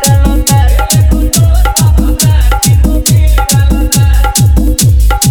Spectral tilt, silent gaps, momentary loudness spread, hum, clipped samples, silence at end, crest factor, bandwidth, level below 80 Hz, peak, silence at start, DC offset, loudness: -4.5 dB/octave; none; 1 LU; none; under 0.1%; 0 s; 6 dB; over 20 kHz; -10 dBFS; 0 dBFS; 0 s; 0.8%; -8 LUFS